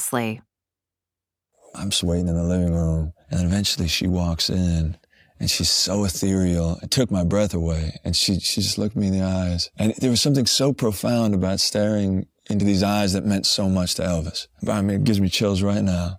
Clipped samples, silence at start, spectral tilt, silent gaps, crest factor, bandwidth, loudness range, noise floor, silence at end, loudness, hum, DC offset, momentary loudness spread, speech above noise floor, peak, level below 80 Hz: under 0.1%; 0 s; -4.5 dB/octave; none; 16 dB; 16.5 kHz; 2 LU; -88 dBFS; 0 s; -21 LUFS; none; under 0.1%; 7 LU; 67 dB; -6 dBFS; -38 dBFS